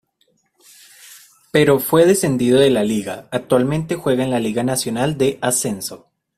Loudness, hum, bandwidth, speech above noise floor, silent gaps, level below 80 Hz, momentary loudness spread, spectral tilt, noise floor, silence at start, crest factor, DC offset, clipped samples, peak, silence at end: -17 LUFS; none; 16 kHz; 47 dB; none; -52 dBFS; 10 LU; -5 dB/octave; -64 dBFS; 1.1 s; 16 dB; under 0.1%; under 0.1%; -2 dBFS; 0.4 s